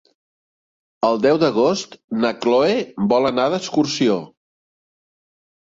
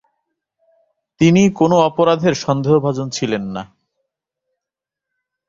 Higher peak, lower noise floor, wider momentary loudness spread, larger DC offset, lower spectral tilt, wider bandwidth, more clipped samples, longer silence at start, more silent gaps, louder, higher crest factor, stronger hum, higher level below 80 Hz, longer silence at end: about the same, -4 dBFS vs -2 dBFS; first, under -90 dBFS vs -85 dBFS; second, 6 LU vs 10 LU; neither; about the same, -5 dB/octave vs -6 dB/octave; about the same, 7.8 kHz vs 7.8 kHz; neither; second, 1 s vs 1.2 s; first, 2.04-2.08 s vs none; second, -19 LUFS vs -15 LUFS; about the same, 18 dB vs 16 dB; neither; second, -62 dBFS vs -54 dBFS; second, 1.45 s vs 1.85 s